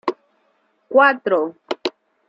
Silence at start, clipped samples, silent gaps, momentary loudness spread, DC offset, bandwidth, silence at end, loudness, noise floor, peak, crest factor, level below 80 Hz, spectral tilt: 0.05 s; under 0.1%; none; 13 LU; under 0.1%; 7.4 kHz; 0.4 s; -19 LUFS; -64 dBFS; -2 dBFS; 20 dB; -74 dBFS; -4.5 dB/octave